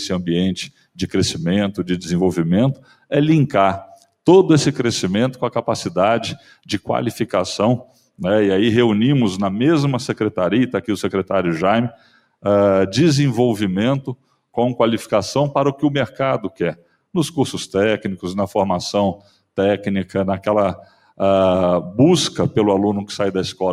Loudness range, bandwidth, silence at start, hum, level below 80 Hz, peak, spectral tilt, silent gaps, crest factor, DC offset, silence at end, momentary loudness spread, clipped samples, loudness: 4 LU; 15 kHz; 0 s; none; -56 dBFS; 0 dBFS; -6 dB/octave; none; 18 dB; under 0.1%; 0 s; 9 LU; under 0.1%; -18 LUFS